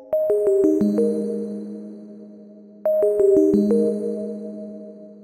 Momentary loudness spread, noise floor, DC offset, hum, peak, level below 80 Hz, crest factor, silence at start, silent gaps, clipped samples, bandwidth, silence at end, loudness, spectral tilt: 22 LU; -44 dBFS; under 0.1%; none; -6 dBFS; -58 dBFS; 16 dB; 0 s; none; under 0.1%; 14 kHz; 0 s; -20 LUFS; -9 dB/octave